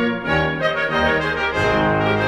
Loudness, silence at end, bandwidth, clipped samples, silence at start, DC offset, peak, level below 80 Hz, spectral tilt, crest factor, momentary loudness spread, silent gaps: -18 LUFS; 0 s; 12.5 kHz; under 0.1%; 0 s; under 0.1%; -4 dBFS; -38 dBFS; -6 dB/octave; 14 dB; 2 LU; none